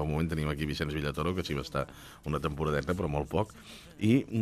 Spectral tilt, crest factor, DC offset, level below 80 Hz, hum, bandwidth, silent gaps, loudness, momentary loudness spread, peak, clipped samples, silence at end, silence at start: -6.5 dB/octave; 18 dB; under 0.1%; -46 dBFS; none; 14.5 kHz; none; -32 LUFS; 11 LU; -14 dBFS; under 0.1%; 0 s; 0 s